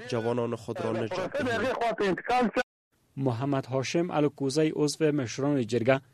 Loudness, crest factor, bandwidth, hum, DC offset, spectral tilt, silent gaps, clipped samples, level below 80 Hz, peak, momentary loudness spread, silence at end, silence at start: -28 LUFS; 20 dB; 13.5 kHz; none; under 0.1%; -5.5 dB/octave; 2.63-2.91 s; under 0.1%; -62 dBFS; -8 dBFS; 6 LU; 0.15 s; 0 s